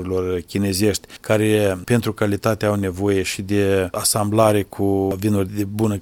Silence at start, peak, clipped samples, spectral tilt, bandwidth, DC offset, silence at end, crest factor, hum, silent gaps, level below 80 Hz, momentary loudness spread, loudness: 0 s; 0 dBFS; under 0.1%; -5 dB/octave; 18 kHz; under 0.1%; 0 s; 18 dB; none; none; -48 dBFS; 5 LU; -20 LUFS